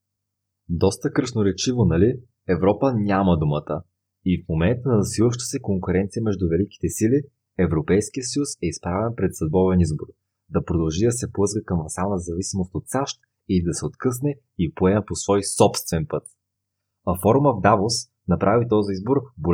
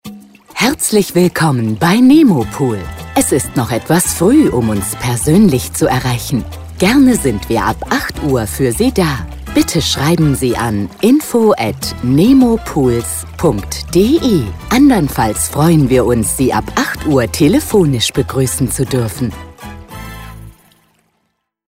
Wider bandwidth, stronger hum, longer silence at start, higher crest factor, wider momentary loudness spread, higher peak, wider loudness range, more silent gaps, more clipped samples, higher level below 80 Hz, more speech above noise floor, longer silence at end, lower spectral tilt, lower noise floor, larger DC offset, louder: about the same, 16.5 kHz vs 16.5 kHz; neither; first, 0.7 s vs 0.05 s; first, 20 dB vs 12 dB; about the same, 9 LU vs 10 LU; about the same, -2 dBFS vs 0 dBFS; about the same, 3 LU vs 3 LU; neither; neither; second, -44 dBFS vs -32 dBFS; first, 59 dB vs 54 dB; second, 0 s vs 1.2 s; about the same, -6 dB/octave vs -5 dB/octave; first, -80 dBFS vs -67 dBFS; neither; second, -22 LUFS vs -13 LUFS